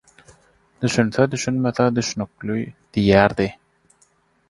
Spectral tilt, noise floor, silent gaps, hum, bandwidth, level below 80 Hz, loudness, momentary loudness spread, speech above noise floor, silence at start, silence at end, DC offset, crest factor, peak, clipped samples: -5.5 dB/octave; -61 dBFS; none; none; 11.5 kHz; -46 dBFS; -20 LUFS; 11 LU; 41 dB; 0.8 s; 1 s; under 0.1%; 22 dB; 0 dBFS; under 0.1%